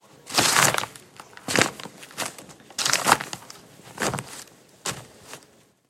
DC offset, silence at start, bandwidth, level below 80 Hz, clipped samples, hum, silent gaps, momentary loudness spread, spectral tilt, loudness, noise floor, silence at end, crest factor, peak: under 0.1%; 0.25 s; 16.5 kHz; -60 dBFS; under 0.1%; none; none; 25 LU; -1.5 dB/octave; -23 LUFS; -57 dBFS; 0.5 s; 28 dB; 0 dBFS